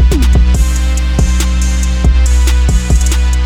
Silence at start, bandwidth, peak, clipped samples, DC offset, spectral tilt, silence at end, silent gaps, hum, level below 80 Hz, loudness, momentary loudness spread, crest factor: 0 s; 14 kHz; 0 dBFS; under 0.1%; under 0.1%; -5 dB/octave; 0 s; none; none; -10 dBFS; -12 LUFS; 3 LU; 8 dB